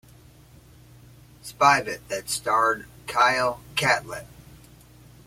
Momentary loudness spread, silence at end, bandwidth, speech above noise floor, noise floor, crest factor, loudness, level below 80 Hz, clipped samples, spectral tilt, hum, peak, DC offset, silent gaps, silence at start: 19 LU; 1 s; 16.5 kHz; 27 dB; -51 dBFS; 22 dB; -23 LUFS; -56 dBFS; under 0.1%; -2.5 dB/octave; none; -4 dBFS; under 0.1%; none; 1.45 s